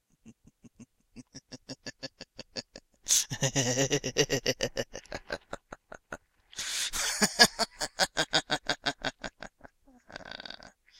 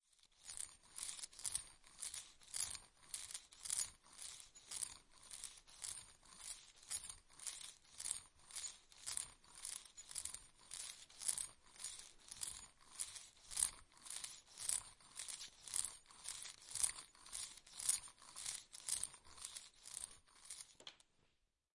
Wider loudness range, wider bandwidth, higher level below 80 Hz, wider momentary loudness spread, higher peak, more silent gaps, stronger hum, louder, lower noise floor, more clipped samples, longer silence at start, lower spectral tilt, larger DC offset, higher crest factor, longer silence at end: about the same, 5 LU vs 6 LU; first, 16.5 kHz vs 12 kHz; first, -56 dBFS vs -74 dBFS; first, 22 LU vs 14 LU; first, -2 dBFS vs -16 dBFS; neither; neither; first, -28 LUFS vs -46 LUFS; second, -58 dBFS vs -82 dBFS; neither; about the same, 0.25 s vs 0.25 s; first, -2 dB/octave vs 2 dB/octave; neither; about the same, 32 dB vs 34 dB; second, 0.3 s vs 0.8 s